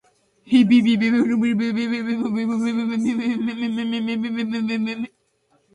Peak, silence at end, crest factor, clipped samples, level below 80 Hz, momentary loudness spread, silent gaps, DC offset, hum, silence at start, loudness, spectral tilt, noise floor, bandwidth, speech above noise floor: -6 dBFS; 0.65 s; 16 dB; under 0.1%; -64 dBFS; 9 LU; none; under 0.1%; none; 0.45 s; -21 LUFS; -6 dB/octave; -64 dBFS; 10 kHz; 44 dB